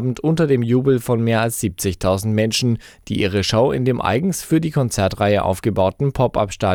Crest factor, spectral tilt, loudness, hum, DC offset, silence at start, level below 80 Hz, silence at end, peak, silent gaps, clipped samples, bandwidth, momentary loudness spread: 12 dB; -5.5 dB/octave; -19 LUFS; none; under 0.1%; 0 s; -42 dBFS; 0 s; -6 dBFS; none; under 0.1%; 18.5 kHz; 4 LU